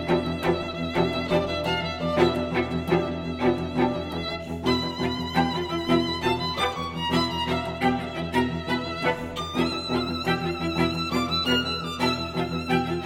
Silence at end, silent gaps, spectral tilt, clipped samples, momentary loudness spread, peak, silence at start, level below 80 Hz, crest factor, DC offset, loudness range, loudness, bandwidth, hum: 0 s; none; -5.5 dB/octave; under 0.1%; 5 LU; -8 dBFS; 0 s; -46 dBFS; 18 dB; under 0.1%; 1 LU; -26 LUFS; 16.5 kHz; none